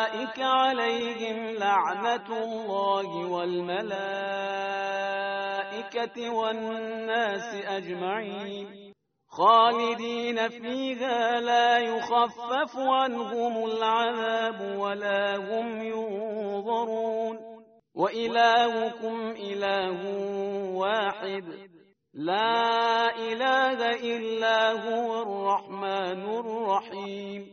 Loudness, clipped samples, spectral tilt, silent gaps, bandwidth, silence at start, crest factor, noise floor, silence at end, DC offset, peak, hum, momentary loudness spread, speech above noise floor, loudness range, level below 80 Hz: -27 LUFS; under 0.1%; -1 dB/octave; none; 6.6 kHz; 0 s; 20 dB; -56 dBFS; 0 s; under 0.1%; -8 dBFS; none; 10 LU; 28 dB; 5 LU; -76 dBFS